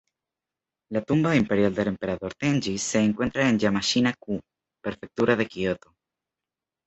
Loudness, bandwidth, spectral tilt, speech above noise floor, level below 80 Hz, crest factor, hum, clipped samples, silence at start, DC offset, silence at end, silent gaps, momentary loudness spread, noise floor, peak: -25 LUFS; 8.2 kHz; -5 dB/octave; 65 dB; -54 dBFS; 20 dB; none; under 0.1%; 0.9 s; under 0.1%; 1.1 s; none; 12 LU; -89 dBFS; -6 dBFS